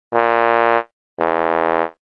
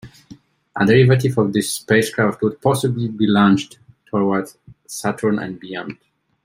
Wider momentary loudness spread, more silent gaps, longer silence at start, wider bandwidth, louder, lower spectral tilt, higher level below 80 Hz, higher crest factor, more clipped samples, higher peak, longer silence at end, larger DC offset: second, 7 LU vs 16 LU; first, 0.93-1.17 s vs none; about the same, 0.1 s vs 0.05 s; second, 6 kHz vs 16 kHz; about the same, -17 LUFS vs -18 LUFS; about the same, -7 dB/octave vs -6 dB/octave; second, -62 dBFS vs -56 dBFS; about the same, 16 dB vs 16 dB; neither; about the same, -2 dBFS vs -2 dBFS; second, 0.25 s vs 0.5 s; neither